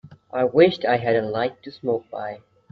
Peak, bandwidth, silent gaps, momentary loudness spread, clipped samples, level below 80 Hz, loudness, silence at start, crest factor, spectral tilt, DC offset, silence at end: -4 dBFS; 6 kHz; none; 15 LU; under 0.1%; -62 dBFS; -22 LUFS; 0.05 s; 20 dB; -8 dB/octave; under 0.1%; 0.35 s